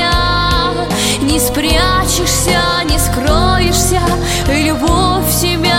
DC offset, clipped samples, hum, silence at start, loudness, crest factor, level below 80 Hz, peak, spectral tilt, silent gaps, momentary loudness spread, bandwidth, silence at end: under 0.1%; under 0.1%; none; 0 s; -12 LUFS; 12 dB; -20 dBFS; 0 dBFS; -3.5 dB/octave; none; 2 LU; 17 kHz; 0 s